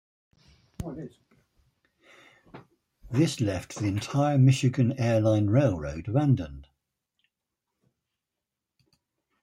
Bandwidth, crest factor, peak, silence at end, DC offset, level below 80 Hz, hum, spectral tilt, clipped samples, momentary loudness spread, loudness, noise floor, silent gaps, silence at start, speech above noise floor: 12 kHz; 18 dB; -10 dBFS; 2.8 s; under 0.1%; -54 dBFS; none; -7 dB/octave; under 0.1%; 18 LU; -25 LUFS; -87 dBFS; none; 0.8 s; 62 dB